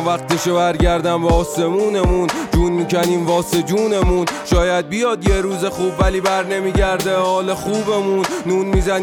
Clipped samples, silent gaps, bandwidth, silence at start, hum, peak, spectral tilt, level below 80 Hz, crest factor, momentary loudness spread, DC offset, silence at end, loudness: under 0.1%; none; 19 kHz; 0 s; none; -2 dBFS; -5.5 dB/octave; -26 dBFS; 14 dB; 3 LU; under 0.1%; 0 s; -17 LUFS